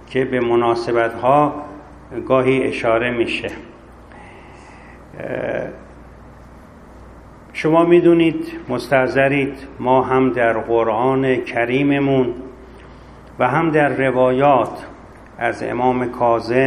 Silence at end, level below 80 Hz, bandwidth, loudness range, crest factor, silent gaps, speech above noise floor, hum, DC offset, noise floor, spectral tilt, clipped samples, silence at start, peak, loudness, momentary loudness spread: 0 s; -46 dBFS; 11 kHz; 12 LU; 18 dB; none; 24 dB; none; under 0.1%; -41 dBFS; -7 dB/octave; under 0.1%; 0 s; 0 dBFS; -17 LUFS; 15 LU